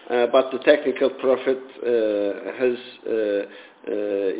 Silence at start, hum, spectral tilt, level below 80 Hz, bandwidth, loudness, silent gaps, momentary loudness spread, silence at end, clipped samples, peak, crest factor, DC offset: 0.05 s; none; -8.5 dB/octave; -72 dBFS; 4 kHz; -22 LUFS; none; 9 LU; 0 s; under 0.1%; -4 dBFS; 18 dB; under 0.1%